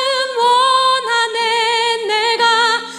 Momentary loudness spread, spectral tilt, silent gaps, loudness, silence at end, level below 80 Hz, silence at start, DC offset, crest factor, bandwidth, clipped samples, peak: 4 LU; 0.5 dB/octave; none; -14 LUFS; 0 s; -82 dBFS; 0 s; under 0.1%; 12 dB; 13 kHz; under 0.1%; -4 dBFS